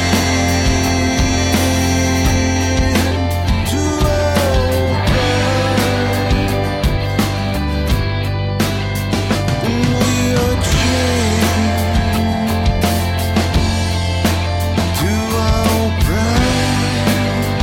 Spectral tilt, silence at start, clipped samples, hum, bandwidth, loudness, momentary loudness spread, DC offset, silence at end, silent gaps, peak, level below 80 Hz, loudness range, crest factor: -5 dB/octave; 0 s; under 0.1%; none; 16.5 kHz; -16 LUFS; 3 LU; under 0.1%; 0 s; none; -4 dBFS; -24 dBFS; 2 LU; 12 dB